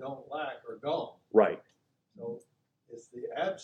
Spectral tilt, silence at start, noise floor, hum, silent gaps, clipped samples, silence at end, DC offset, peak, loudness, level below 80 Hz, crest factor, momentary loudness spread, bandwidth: -6 dB/octave; 0 s; -73 dBFS; none; none; under 0.1%; 0 s; under 0.1%; -10 dBFS; -33 LUFS; -84 dBFS; 24 dB; 21 LU; 8.6 kHz